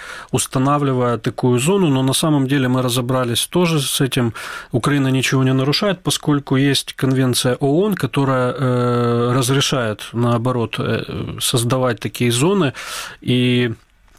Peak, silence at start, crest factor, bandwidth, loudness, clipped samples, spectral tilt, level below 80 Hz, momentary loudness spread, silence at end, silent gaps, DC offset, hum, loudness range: -4 dBFS; 0 s; 12 dB; 16 kHz; -17 LUFS; under 0.1%; -5 dB/octave; -48 dBFS; 6 LU; 0.45 s; none; 0.2%; none; 2 LU